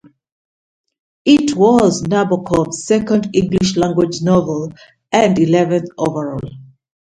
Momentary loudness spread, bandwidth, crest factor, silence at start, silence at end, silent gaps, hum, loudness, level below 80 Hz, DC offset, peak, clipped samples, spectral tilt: 11 LU; 11 kHz; 16 dB; 1.25 s; 0.35 s; none; none; -15 LUFS; -46 dBFS; under 0.1%; 0 dBFS; under 0.1%; -6 dB/octave